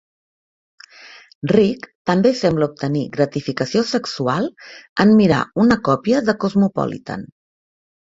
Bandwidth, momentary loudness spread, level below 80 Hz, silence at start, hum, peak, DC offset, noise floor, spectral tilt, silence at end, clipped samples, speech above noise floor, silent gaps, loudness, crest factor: 7.8 kHz; 12 LU; -52 dBFS; 1.05 s; none; -2 dBFS; under 0.1%; -44 dBFS; -6.5 dB/octave; 0.85 s; under 0.1%; 26 dB; 1.35-1.42 s, 1.95-2.05 s, 4.89-4.96 s; -18 LUFS; 18 dB